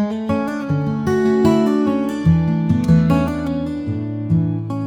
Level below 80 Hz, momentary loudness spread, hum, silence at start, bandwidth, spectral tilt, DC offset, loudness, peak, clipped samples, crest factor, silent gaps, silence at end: -42 dBFS; 8 LU; none; 0 s; 9.8 kHz; -8.5 dB/octave; 0.1%; -18 LUFS; -2 dBFS; under 0.1%; 14 dB; none; 0 s